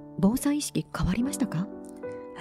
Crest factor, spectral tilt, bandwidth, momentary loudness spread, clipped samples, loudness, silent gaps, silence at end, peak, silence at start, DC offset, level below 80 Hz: 16 dB; -5.5 dB/octave; 16 kHz; 14 LU; under 0.1%; -28 LUFS; none; 0 s; -14 dBFS; 0 s; under 0.1%; -44 dBFS